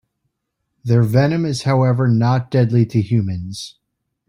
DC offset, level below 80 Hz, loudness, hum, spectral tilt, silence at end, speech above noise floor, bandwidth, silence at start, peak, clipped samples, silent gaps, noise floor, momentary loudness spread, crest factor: under 0.1%; -52 dBFS; -17 LUFS; none; -7.5 dB/octave; 0.6 s; 59 dB; 11 kHz; 0.85 s; -2 dBFS; under 0.1%; none; -75 dBFS; 14 LU; 14 dB